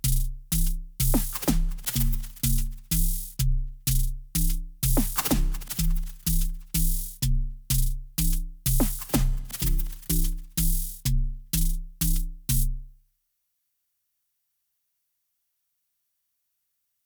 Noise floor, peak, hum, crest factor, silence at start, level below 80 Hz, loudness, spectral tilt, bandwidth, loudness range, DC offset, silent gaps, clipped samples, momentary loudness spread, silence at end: -77 dBFS; -8 dBFS; none; 18 dB; 0.05 s; -28 dBFS; -28 LUFS; -4 dB/octave; over 20 kHz; 4 LU; under 0.1%; none; under 0.1%; 5 LU; 4.15 s